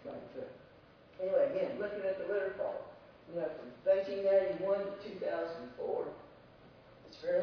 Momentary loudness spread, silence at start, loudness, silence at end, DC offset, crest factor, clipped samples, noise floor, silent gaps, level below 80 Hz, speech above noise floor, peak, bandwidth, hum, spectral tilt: 17 LU; 0 s; -36 LUFS; 0 s; under 0.1%; 18 dB; under 0.1%; -60 dBFS; none; -72 dBFS; 25 dB; -20 dBFS; 5.4 kHz; none; -4.5 dB/octave